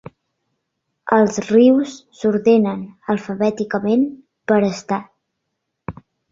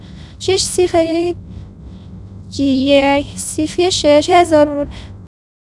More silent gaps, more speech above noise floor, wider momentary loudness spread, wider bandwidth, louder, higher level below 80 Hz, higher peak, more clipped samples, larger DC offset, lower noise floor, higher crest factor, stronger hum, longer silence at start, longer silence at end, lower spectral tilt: neither; first, 59 dB vs 20 dB; second, 19 LU vs 24 LU; second, 7.6 kHz vs 12 kHz; second, -18 LUFS vs -14 LUFS; second, -58 dBFS vs -38 dBFS; about the same, -2 dBFS vs 0 dBFS; neither; neither; first, -76 dBFS vs -34 dBFS; about the same, 18 dB vs 16 dB; neither; first, 1.05 s vs 0 s; about the same, 0.4 s vs 0.4 s; first, -6.5 dB/octave vs -4 dB/octave